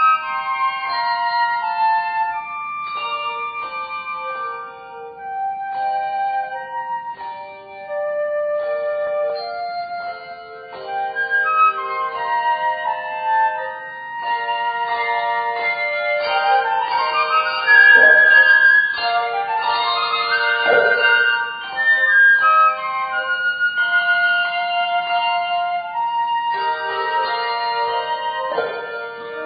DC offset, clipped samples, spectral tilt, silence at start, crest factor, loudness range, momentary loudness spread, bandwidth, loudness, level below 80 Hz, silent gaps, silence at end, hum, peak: under 0.1%; under 0.1%; 3.5 dB/octave; 0 s; 18 dB; 13 LU; 16 LU; 5 kHz; -17 LUFS; -68 dBFS; none; 0 s; none; 0 dBFS